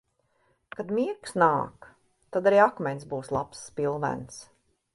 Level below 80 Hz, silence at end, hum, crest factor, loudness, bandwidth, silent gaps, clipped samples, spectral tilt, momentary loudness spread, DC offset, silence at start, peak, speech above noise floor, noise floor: -62 dBFS; 0.5 s; none; 22 dB; -27 LUFS; 11.5 kHz; none; under 0.1%; -6 dB/octave; 17 LU; under 0.1%; 0.8 s; -6 dBFS; 43 dB; -70 dBFS